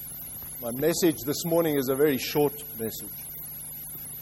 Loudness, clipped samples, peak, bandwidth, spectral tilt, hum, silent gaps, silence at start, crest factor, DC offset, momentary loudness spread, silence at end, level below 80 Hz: -28 LUFS; under 0.1%; -12 dBFS; 16.5 kHz; -4.5 dB/octave; none; none; 0 s; 16 dB; under 0.1%; 12 LU; 0 s; -58 dBFS